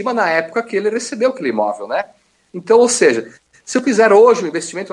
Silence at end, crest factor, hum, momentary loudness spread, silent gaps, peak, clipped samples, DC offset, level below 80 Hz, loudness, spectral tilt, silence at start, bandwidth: 0 s; 14 dB; none; 13 LU; none; 0 dBFS; under 0.1%; under 0.1%; -66 dBFS; -15 LUFS; -3.5 dB/octave; 0 s; 11.5 kHz